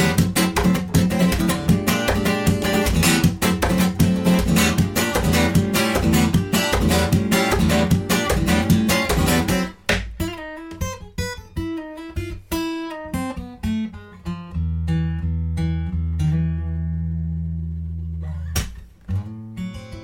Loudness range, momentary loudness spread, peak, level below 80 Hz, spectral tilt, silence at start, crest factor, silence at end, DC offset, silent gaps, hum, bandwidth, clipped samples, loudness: 10 LU; 12 LU; -4 dBFS; -30 dBFS; -5 dB/octave; 0 s; 16 dB; 0 s; under 0.1%; none; none; 17 kHz; under 0.1%; -21 LUFS